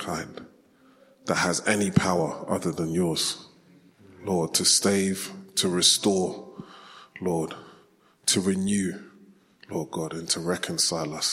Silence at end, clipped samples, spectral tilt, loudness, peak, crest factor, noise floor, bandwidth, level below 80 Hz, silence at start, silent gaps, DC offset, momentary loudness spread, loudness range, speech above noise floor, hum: 0 s; under 0.1%; -3 dB/octave; -25 LUFS; -4 dBFS; 22 dB; -59 dBFS; 16.5 kHz; -62 dBFS; 0 s; none; under 0.1%; 20 LU; 5 LU; 34 dB; none